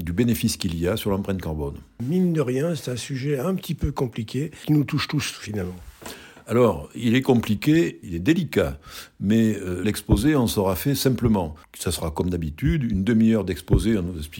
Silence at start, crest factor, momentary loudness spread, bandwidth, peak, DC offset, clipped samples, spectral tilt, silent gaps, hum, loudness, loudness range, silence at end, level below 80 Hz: 0 s; 18 dB; 11 LU; 17 kHz; -6 dBFS; under 0.1%; under 0.1%; -6 dB/octave; none; none; -23 LUFS; 4 LU; 0 s; -38 dBFS